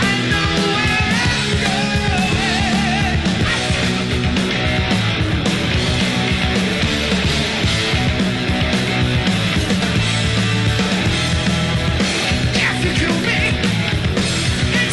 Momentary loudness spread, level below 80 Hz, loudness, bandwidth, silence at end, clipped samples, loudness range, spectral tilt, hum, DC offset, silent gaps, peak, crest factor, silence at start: 2 LU; -28 dBFS; -17 LUFS; 12 kHz; 0 s; under 0.1%; 1 LU; -4.5 dB/octave; none; under 0.1%; none; -4 dBFS; 12 dB; 0 s